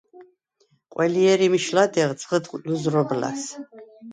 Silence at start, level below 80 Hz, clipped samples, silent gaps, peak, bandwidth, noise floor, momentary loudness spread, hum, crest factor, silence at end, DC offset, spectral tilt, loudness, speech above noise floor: 0.15 s; -70 dBFS; under 0.1%; none; -6 dBFS; 9.4 kHz; -66 dBFS; 16 LU; none; 18 dB; 0 s; under 0.1%; -5 dB/octave; -22 LUFS; 44 dB